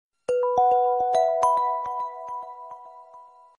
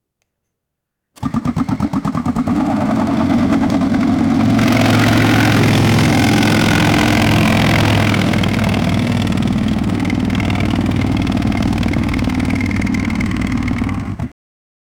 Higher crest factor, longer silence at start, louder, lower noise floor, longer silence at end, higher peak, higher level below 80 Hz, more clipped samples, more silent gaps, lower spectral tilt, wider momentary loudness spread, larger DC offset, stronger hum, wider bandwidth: about the same, 16 dB vs 12 dB; second, 0.3 s vs 1.2 s; second, -23 LUFS vs -15 LUFS; second, -49 dBFS vs -77 dBFS; second, 0.35 s vs 0.7 s; second, -10 dBFS vs -2 dBFS; second, -66 dBFS vs -30 dBFS; neither; neither; second, -3.5 dB/octave vs -6 dB/octave; first, 19 LU vs 7 LU; neither; neither; second, 11 kHz vs 19.5 kHz